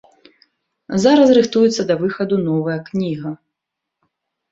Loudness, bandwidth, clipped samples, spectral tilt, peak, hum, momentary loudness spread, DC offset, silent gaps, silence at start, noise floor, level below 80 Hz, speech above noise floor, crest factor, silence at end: -16 LUFS; 8 kHz; under 0.1%; -6 dB/octave; -2 dBFS; none; 13 LU; under 0.1%; none; 0.9 s; -81 dBFS; -58 dBFS; 65 dB; 16 dB; 1.15 s